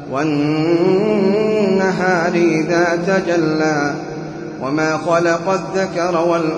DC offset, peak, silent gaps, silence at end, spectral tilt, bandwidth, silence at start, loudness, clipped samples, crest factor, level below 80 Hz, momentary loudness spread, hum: under 0.1%; -2 dBFS; none; 0 s; -6 dB/octave; 10 kHz; 0 s; -16 LUFS; under 0.1%; 14 dB; -52 dBFS; 7 LU; none